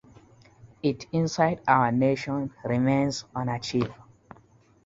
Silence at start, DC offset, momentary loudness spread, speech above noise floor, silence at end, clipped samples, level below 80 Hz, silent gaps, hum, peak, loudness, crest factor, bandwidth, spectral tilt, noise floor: 0.65 s; under 0.1%; 9 LU; 33 dB; 0.9 s; under 0.1%; -58 dBFS; none; none; -6 dBFS; -26 LUFS; 22 dB; 7.8 kHz; -6 dB/octave; -58 dBFS